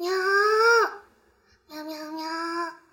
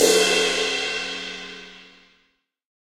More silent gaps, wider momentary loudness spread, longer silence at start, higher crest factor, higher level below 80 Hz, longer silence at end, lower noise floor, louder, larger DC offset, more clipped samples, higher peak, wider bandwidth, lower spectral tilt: neither; about the same, 19 LU vs 21 LU; about the same, 0 s vs 0 s; about the same, 16 dB vs 20 dB; second, -74 dBFS vs -56 dBFS; second, 0.2 s vs 1 s; second, -62 dBFS vs -68 dBFS; about the same, -23 LUFS vs -21 LUFS; neither; neither; second, -10 dBFS vs -4 dBFS; about the same, 17 kHz vs 16 kHz; about the same, -1 dB/octave vs -1 dB/octave